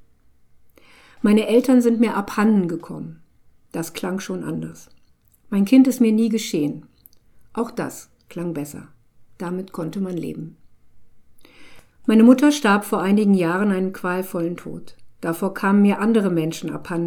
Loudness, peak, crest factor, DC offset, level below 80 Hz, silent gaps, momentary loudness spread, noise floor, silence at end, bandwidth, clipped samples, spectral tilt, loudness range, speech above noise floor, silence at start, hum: -20 LUFS; 0 dBFS; 20 dB; under 0.1%; -60 dBFS; none; 19 LU; -55 dBFS; 0 s; 17.5 kHz; under 0.1%; -6.5 dB/octave; 13 LU; 36 dB; 1.2 s; none